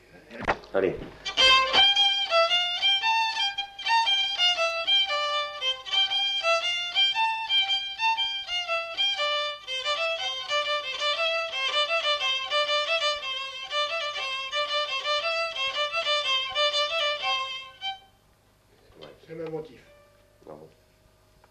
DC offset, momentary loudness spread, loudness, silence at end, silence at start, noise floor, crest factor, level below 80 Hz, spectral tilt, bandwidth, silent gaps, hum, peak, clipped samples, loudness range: under 0.1%; 9 LU; -24 LUFS; 0.85 s; 0.15 s; -62 dBFS; 18 dB; -60 dBFS; -0.5 dB/octave; 14 kHz; none; none; -8 dBFS; under 0.1%; 9 LU